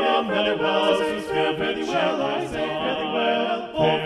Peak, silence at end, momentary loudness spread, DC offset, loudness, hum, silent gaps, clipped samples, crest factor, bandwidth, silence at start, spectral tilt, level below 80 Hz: -8 dBFS; 0 s; 5 LU; under 0.1%; -23 LUFS; none; none; under 0.1%; 16 dB; 12.5 kHz; 0 s; -5 dB/octave; -54 dBFS